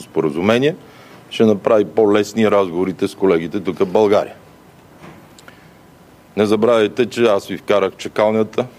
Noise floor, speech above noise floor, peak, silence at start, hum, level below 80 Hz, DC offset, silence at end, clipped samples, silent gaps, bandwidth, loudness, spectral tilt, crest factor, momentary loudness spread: -45 dBFS; 30 dB; 0 dBFS; 0 s; none; -58 dBFS; under 0.1%; 0.1 s; under 0.1%; none; 15 kHz; -16 LUFS; -6 dB/octave; 16 dB; 7 LU